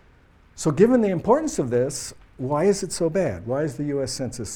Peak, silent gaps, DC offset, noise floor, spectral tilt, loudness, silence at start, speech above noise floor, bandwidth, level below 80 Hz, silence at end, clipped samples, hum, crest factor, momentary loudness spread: -4 dBFS; none; under 0.1%; -54 dBFS; -5.5 dB/octave; -23 LUFS; 0.55 s; 32 dB; 17 kHz; -50 dBFS; 0 s; under 0.1%; none; 18 dB; 10 LU